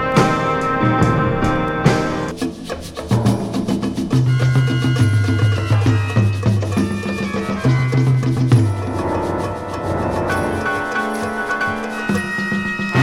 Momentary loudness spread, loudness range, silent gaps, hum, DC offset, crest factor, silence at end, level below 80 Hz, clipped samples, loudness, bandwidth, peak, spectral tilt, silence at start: 6 LU; 4 LU; none; none; under 0.1%; 18 dB; 0 s; -38 dBFS; under 0.1%; -18 LUFS; 13 kHz; 0 dBFS; -7 dB/octave; 0 s